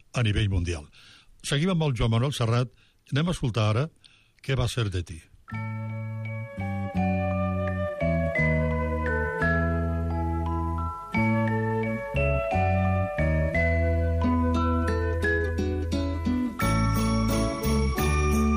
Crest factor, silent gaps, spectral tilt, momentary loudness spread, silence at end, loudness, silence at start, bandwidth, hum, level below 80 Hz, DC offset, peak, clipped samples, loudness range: 12 dB; none; -6.5 dB/octave; 9 LU; 0 s; -26 LUFS; 0.15 s; 15 kHz; none; -34 dBFS; under 0.1%; -14 dBFS; under 0.1%; 5 LU